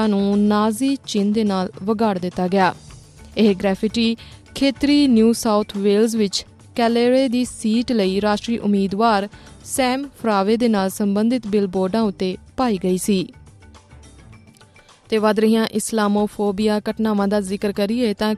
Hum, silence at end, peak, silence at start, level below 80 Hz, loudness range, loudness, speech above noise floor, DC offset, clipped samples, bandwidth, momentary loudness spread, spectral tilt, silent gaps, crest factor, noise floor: none; 0 s; -4 dBFS; 0 s; -50 dBFS; 4 LU; -19 LUFS; 30 dB; under 0.1%; under 0.1%; 13.5 kHz; 7 LU; -5.5 dB/octave; none; 14 dB; -49 dBFS